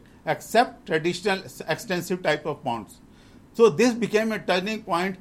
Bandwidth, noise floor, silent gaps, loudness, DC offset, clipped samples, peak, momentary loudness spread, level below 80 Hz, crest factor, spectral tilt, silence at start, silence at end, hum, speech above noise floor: 16 kHz; -50 dBFS; none; -24 LUFS; under 0.1%; under 0.1%; -6 dBFS; 10 LU; -58 dBFS; 18 dB; -4.5 dB/octave; 0.25 s; 0.05 s; none; 26 dB